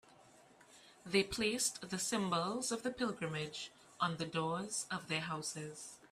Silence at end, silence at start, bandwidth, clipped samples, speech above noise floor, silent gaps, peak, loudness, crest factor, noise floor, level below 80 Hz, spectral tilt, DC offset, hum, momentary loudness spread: 0.05 s; 0.2 s; 15.5 kHz; under 0.1%; 25 dB; none; -18 dBFS; -38 LUFS; 22 dB; -63 dBFS; -68 dBFS; -3 dB/octave; under 0.1%; none; 11 LU